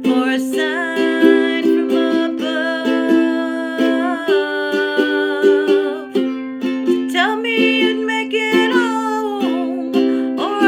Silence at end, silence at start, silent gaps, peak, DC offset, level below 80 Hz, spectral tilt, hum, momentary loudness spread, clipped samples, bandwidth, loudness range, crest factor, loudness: 0 s; 0 s; none; 0 dBFS; under 0.1%; -74 dBFS; -4 dB/octave; none; 6 LU; under 0.1%; 16 kHz; 1 LU; 16 dB; -16 LUFS